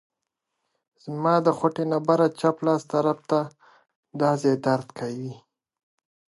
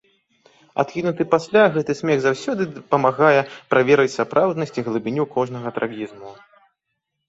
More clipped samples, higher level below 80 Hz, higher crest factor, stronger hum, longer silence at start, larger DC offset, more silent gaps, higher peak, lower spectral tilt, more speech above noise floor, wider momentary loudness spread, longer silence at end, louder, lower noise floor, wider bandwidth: neither; second, -74 dBFS vs -64 dBFS; about the same, 20 dB vs 18 dB; neither; first, 1.05 s vs 0.75 s; neither; first, 3.96-4.03 s vs none; second, -6 dBFS vs -2 dBFS; about the same, -7 dB/octave vs -6 dB/octave; about the same, 59 dB vs 58 dB; first, 15 LU vs 10 LU; about the same, 0.9 s vs 0.95 s; second, -24 LUFS vs -20 LUFS; first, -82 dBFS vs -77 dBFS; first, 11.5 kHz vs 8 kHz